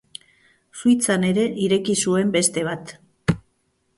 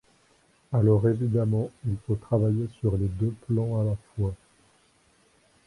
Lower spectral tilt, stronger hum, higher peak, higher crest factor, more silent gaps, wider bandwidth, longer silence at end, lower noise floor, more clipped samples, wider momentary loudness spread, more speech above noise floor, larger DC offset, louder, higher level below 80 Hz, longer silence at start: second, -4.5 dB/octave vs -10.5 dB/octave; neither; first, -4 dBFS vs -10 dBFS; about the same, 18 dB vs 18 dB; neither; about the same, 11.5 kHz vs 10.5 kHz; second, 0.6 s vs 1.3 s; first, -68 dBFS vs -63 dBFS; neither; first, 22 LU vs 9 LU; first, 48 dB vs 38 dB; neither; first, -21 LUFS vs -27 LUFS; about the same, -50 dBFS vs -46 dBFS; about the same, 0.75 s vs 0.7 s